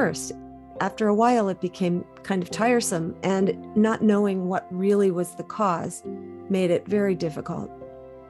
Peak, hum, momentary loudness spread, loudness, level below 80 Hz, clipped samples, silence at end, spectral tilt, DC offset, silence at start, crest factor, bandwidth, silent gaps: -8 dBFS; none; 14 LU; -24 LUFS; -60 dBFS; under 0.1%; 0 s; -6 dB/octave; under 0.1%; 0 s; 16 dB; 12.5 kHz; none